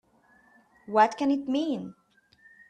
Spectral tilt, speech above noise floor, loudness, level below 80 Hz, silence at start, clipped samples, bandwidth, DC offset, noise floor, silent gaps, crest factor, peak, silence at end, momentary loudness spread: -5.5 dB/octave; 36 dB; -26 LUFS; -74 dBFS; 0.9 s; under 0.1%; 9.2 kHz; under 0.1%; -62 dBFS; none; 22 dB; -8 dBFS; 0.75 s; 12 LU